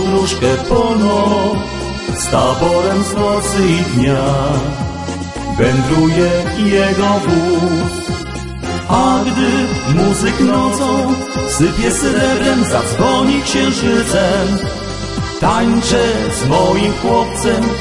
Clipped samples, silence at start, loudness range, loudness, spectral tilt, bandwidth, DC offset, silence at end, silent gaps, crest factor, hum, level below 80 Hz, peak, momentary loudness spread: under 0.1%; 0 s; 1 LU; -14 LUFS; -5 dB/octave; 11.5 kHz; 0.4%; 0 s; none; 14 dB; none; -30 dBFS; 0 dBFS; 9 LU